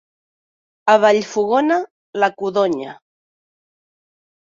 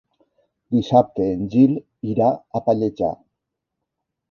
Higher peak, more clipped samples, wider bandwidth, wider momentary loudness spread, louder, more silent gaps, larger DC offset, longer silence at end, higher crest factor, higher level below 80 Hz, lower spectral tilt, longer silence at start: about the same, -2 dBFS vs -2 dBFS; neither; first, 7.6 kHz vs 6.8 kHz; first, 12 LU vs 9 LU; first, -17 LUFS vs -20 LUFS; first, 1.91-2.13 s vs none; neither; first, 1.5 s vs 1.15 s; about the same, 18 dB vs 20 dB; second, -68 dBFS vs -54 dBFS; second, -4.5 dB/octave vs -9.5 dB/octave; first, 0.85 s vs 0.7 s